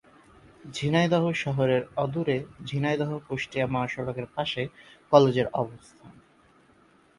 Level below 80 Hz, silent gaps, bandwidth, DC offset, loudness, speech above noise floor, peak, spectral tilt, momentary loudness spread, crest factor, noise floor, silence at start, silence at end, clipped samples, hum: -60 dBFS; none; 11.5 kHz; under 0.1%; -27 LUFS; 33 dB; -2 dBFS; -6.5 dB/octave; 11 LU; 24 dB; -60 dBFS; 0.65 s; 1.05 s; under 0.1%; none